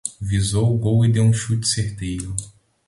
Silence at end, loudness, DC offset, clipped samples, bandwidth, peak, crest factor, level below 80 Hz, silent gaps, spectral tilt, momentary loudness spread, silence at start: 0.4 s; -20 LUFS; under 0.1%; under 0.1%; 11.5 kHz; -4 dBFS; 16 dB; -40 dBFS; none; -5.5 dB/octave; 11 LU; 0.05 s